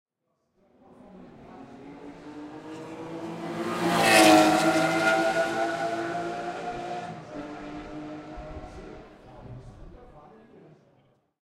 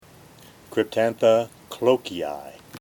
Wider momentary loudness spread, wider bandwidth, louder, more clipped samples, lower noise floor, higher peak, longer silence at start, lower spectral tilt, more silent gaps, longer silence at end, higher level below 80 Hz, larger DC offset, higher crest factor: first, 27 LU vs 14 LU; second, 16 kHz vs 18.5 kHz; about the same, -24 LUFS vs -23 LUFS; neither; first, -77 dBFS vs -49 dBFS; about the same, -4 dBFS vs -6 dBFS; first, 1.05 s vs 0.7 s; second, -3.5 dB/octave vs -5 dB/octave; neither; first, 1.15 s vs 0 s; first, -56 dBFS vs -64 dBFS; neither; first, 24 dB vs 18 dB